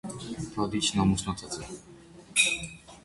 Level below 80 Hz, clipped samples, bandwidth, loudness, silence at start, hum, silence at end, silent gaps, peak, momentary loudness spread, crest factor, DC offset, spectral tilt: -50 dBFS; under 0.1%; 11.5 kHz; -28 LUFS; 0.05 s; none; 0.05 s; none; -8 dBFS; 16 LU; 22 dB; under 0.1%; -3 dB/octave